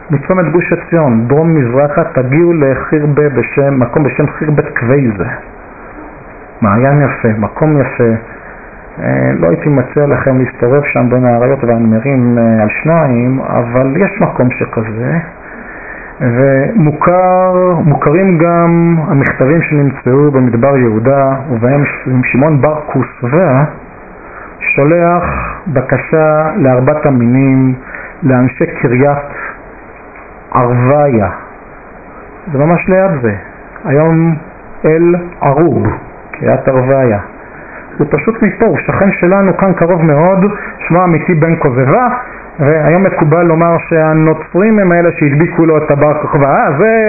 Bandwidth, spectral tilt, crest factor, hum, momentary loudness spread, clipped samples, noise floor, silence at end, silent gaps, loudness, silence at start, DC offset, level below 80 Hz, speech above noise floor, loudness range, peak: 2.7 kHz; -15 dB/octave; 10 dB; none; 11 LU; under 0.1%; -32 dBFS; 0 s; none; -10 LUFS; 0 s; under 0.1%; -36 dBFS; 22 dB; 4 LU; 0 dBFS